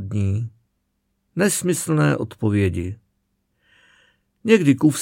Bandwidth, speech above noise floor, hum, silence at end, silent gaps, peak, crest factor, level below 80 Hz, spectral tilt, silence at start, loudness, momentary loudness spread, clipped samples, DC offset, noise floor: 16.5 kHz; 53 dB; none; 0 s; none; 0 dBFS; 20 dB; -52 dBFS; -6 dB/octave; 0 s; -20 LUFS; 16 LU; under 0.1%; under 0.1%; -72 dBFS